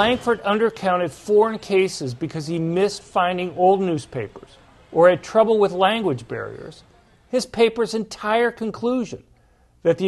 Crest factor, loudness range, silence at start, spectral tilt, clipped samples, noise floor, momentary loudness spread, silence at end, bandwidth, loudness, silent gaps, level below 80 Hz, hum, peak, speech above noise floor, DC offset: 18 dB; 4 LU; 0 s; -5.5 dB/octave; under 0.1%; -57 dBFS; 14 LU; 0 s; 12.5 kHz; -21 LUFS; none; -56 dBFS; none; -2 dBFS; 36 dB; under 0.1%